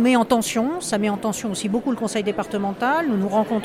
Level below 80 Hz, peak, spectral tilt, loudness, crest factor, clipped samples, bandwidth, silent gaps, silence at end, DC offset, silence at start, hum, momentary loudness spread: -56 dBFS; -4 dBFS; -4.5 dB/octave; -22 LUFS; 18 dB; under 0.1%; 16 kHz; none; 0 s; under 0.1%; 0 s; none; 5 LU